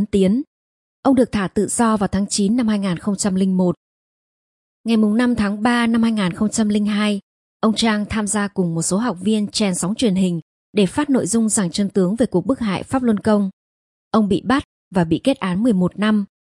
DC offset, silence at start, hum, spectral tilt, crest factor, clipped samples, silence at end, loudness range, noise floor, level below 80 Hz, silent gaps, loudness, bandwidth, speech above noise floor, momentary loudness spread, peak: under 0.1%; 0 s; none; -5 dB/octave; 16 dB; under 0.1%; 0.2 s; 1 LU; under -90 dBFS; -48 dBFS; 0.47-1.03 s, 3.77-4.84 s, 7.23-7.60 s, 10.42-10.73 s, 13.53-14.11 s, 14.65-14.91 s; -19 LUFS; 11.5 kHz; over 72 dB; 5 LU; -2 dBFS